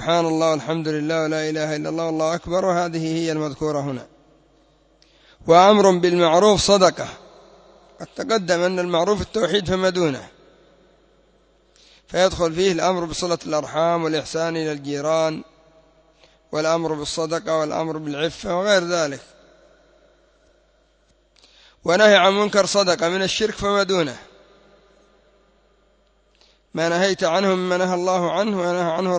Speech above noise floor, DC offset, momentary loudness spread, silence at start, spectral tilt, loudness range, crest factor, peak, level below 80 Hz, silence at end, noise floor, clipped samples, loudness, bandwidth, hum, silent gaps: 41 dB; under 0.1%; 11 LU; 0 s; -4.5 dB/octave; 8 LU; 20 dB; 0 dBFS; -50 dBFS; 0 s; -60 dBFS; under 0.1%; -20 LUFS; 8 kHz; none; none